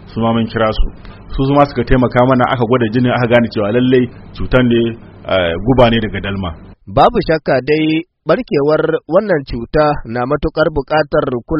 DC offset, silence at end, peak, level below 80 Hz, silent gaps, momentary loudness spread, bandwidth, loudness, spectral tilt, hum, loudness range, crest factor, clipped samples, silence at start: under 0.1%; 0 s; 0 dBFS; -28 dBFS; none; 9 LU; 5.8 kHz; -14 LUFS; -5.5 dB/octave; none; 2 LU; 14 dB; under 0.1%; 0 s